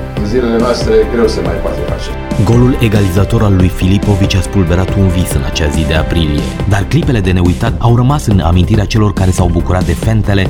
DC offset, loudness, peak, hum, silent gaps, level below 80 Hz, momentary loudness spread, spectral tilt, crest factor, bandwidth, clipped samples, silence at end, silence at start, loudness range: under 0.1%; -12 LUFS; 0 dBFS; none; none; -20 dBFS; 5 LU; -6.5 dB/octave; 10 dB; 17 kHz; under 0.1%; 0 s; 0 s; 1 LU